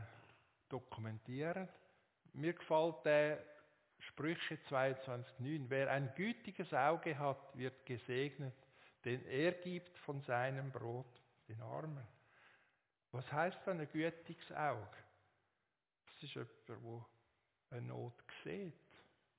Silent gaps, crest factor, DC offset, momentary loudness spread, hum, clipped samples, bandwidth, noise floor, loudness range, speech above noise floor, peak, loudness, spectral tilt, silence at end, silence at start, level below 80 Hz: none; 22 dB; under 0.1%; 17 LU; none; under 0.1%; 4 kHz; under -90 dBFS; 11 LU; over 48 dB; -22 dBFS; -43 LUFS; -5 dB/octave; 0.4 s; 0 s; -82 dBFS